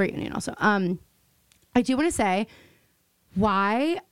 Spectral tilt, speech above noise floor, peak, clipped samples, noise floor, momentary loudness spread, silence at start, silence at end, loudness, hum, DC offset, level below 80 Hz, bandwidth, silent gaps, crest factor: -5 dB/octave; 42 dB; -8 dBFS; under 0.1%; -66 dBFS; 10 LU; 0 s; 0.1 s; -25 LUFS; none; under 0.1%; -52 dBFS; 16 kHz; none; 18 dB